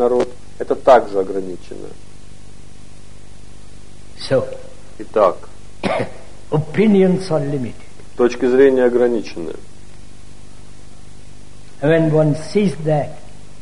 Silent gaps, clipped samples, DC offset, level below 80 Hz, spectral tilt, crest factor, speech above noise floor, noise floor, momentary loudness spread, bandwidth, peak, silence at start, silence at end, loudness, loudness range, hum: none; under 0.1%; 4%; -46 dBFS; -7 dB/octave; 18 dB; 26 dB; -42 dBFS; 20 LU; 11 kHz; 0 dBFS; 0 s; 0.4 s; -17 LUFS; 12 LU; 50 Hz at -45 dBFS